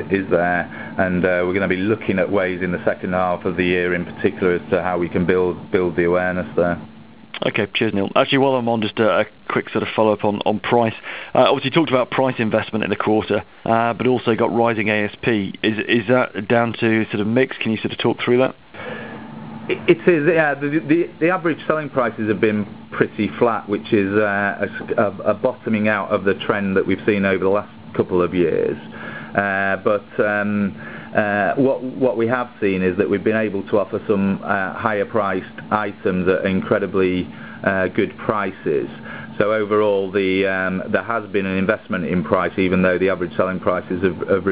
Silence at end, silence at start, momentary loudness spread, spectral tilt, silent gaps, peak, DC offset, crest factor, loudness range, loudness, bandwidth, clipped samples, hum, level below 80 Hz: 0 s; 0 s; 6 LU; -10.5 dB/octave; none; 0 dBFS; 0.4%; 20 dB; 2 LU; -19 LUFS; 4 kHz; under 0.1%; none; -48 dBFS